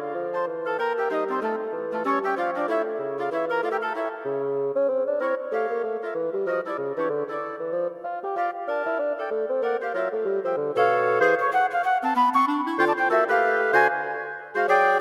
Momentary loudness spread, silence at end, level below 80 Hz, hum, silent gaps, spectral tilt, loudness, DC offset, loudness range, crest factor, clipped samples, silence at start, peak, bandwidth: 8 LU; 0 s; -76 dBFS; none; none; -5.5 dB/octave; -25 LUFS; under 0.1%; 6 LU; 18 dB; under 0.1%; 0 s; -6 dBFS; 13.5 kHz